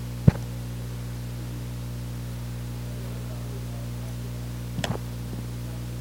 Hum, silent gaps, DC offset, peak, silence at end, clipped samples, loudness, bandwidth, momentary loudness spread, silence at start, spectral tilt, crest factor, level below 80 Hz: 60 Hz at -35 dBFS; none; under 0.1%; -4 dBFS; 0 s; under 0.1%; -32 LUFS; 17 kHz; 6 LU; 0 s; -6.5 dB/octave; 26 dB; -38 dBFS